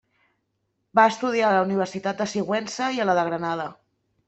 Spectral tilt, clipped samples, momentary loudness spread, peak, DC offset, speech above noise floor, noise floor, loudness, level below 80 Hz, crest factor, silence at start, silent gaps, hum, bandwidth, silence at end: -5 dB/octave; under 0.1%; 8 LU; -4 dBFS; under 0.1%; 52 dB; -75 dBFS; -23 LUFS; -68 dBFS; 22 dB; 0.95 s; none; none; 8.4 kHz; 0.55 s